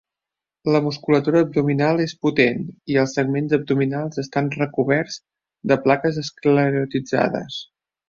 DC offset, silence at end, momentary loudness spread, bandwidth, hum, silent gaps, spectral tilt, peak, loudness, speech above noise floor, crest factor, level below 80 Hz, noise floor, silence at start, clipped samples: under 0.1%; 0.45 s; 10 LU; 7.4 kHz; none; none; -6.5 dB/octave; -2 dBFS; -20 LUFS; 68 dB; 18 dB; -60 dBFS; -87 dBFS; 0.65 s; under 0.1%